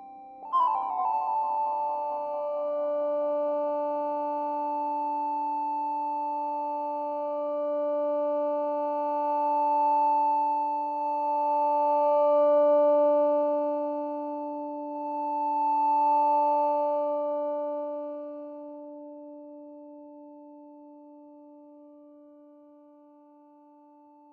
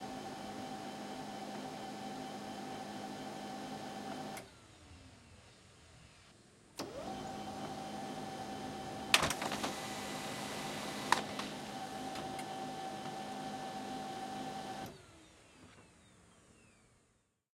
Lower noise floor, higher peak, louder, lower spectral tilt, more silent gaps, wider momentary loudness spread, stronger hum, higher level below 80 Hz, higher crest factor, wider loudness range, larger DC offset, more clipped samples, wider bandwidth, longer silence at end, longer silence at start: second, -55 dBFS vs -76 dBFS; second, -14 dBFS vs -8 dBFS; first, -27 LUFS vs -41 LUFS; first, -6 dB/octave vs -3 dB/octave; neither; second, 18 LU vs 23 LU; neither; second, -84 dBFS vs -70 dBFS; second, 14 dB vs 34 dB; about the same, 12 LU vs 13 LU; neither; neither; second, 4.7 kHz vs 16 kHz; first, 2.15 s vs 0.75 s; about the same, 0 s vs 0 s